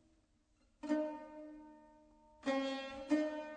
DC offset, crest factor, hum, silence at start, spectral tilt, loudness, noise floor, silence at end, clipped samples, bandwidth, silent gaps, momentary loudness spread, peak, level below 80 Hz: under 0.1%; 20 dB; none; 0.85 s; -4 dB/octave; -40 LUFS; -74 dBFS; 0 s; under 0.1%; 9.2 kHz; none; 18 LU; -22 dBFS; -72 dBFS